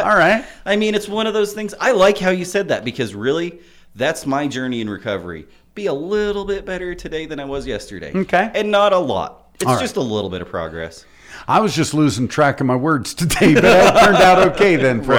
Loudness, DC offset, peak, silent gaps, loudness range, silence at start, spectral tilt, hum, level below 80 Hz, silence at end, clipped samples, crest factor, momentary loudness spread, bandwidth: -17 LUFS; under 0.1%; -4 dBFS; none; 10 LU; 0 s; -5 dB/octave; none; -42 dBFS; 0 s; under 0.1%; 12 dB; 16 LU; 20 kHz